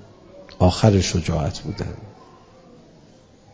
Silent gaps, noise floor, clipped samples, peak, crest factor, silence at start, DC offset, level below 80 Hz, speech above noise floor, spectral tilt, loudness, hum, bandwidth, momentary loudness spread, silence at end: none; -50 dBFS; under 0.1%; 0 dBFS; 24 dB; 0.35 s; under 0.1%; -34 dBFS; 31 dB; -6 dB/octave; -21 LUFS; none; 8 kHz; 15 LU; 1.4 s